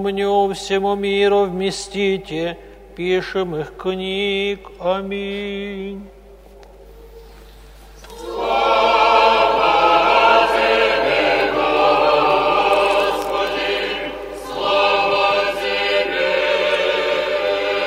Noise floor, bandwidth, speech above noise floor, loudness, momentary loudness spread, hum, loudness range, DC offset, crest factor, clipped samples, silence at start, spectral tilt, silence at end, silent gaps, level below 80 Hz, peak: -42 dBFS; 16 kHz; 22 dB; -17 LUFS; 12 LU; none; 11 LU; under 0.1%; 18 dB; under 0.1%; 0 s; -4 dB/octave; 0 s; none; -44 dBFS; 0 dBFS